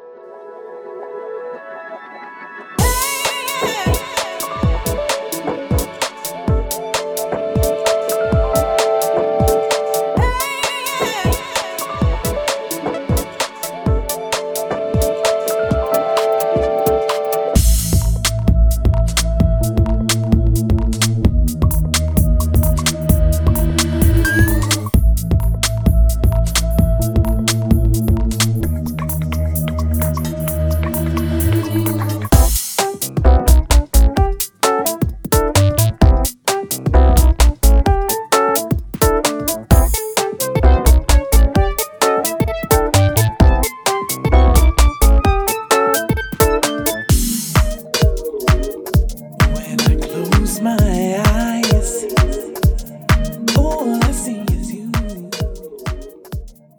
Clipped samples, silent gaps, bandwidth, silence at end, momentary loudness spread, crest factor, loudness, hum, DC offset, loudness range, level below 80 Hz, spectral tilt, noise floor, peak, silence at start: under 0.1%; none; over 20 kHz; 0.3 s; 9 LU; 14 dB; -16 LUFS; none; under 0.1%; 5 LU; -18 dBFS; -5 dB/octave; -36 dBFS; 0 dBFS; 0 s